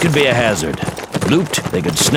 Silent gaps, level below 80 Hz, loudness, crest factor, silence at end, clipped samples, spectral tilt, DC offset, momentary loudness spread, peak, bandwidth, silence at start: none; -40 dBFS; -16 LUFS; 16 dB; 0 s; under 0.1%; -4 dB/octave; under 0.1%; 9 LU; 0 dBFS; 17 kHz; 0 s